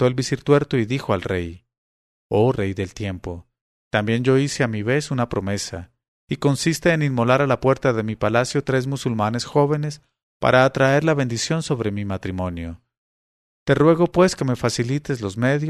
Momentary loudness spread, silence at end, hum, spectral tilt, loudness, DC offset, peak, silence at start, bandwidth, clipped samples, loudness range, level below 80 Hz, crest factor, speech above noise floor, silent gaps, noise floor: 12 LU; 0 s; none; -6 dB/octave; -21 LUFS; under 0.1%; -2 dBFS; 0 s; 13.5 kHz; under 0.1%; 3 LU; -48 dBFS; 20 dB; over 70 dB; 1.78-2.30 s, 3.61-3.91 s, 6.08-6.28 s, 10.23-10.40 s, 12.97-13.66 s; under -90 dBFS